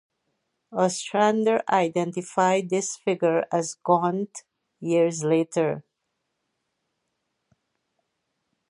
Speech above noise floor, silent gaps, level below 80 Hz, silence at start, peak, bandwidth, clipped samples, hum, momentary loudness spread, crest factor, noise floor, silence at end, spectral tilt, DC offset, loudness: 56 dB; none; -76 dBFS; 0.7 s; -6 dBFS; 11.5 kHz; under 0.1%; none; 9 LU; 20 dB; -79 dBFS; 2.9 s; -5 dB/octave; under 0.1%; -24 LUFS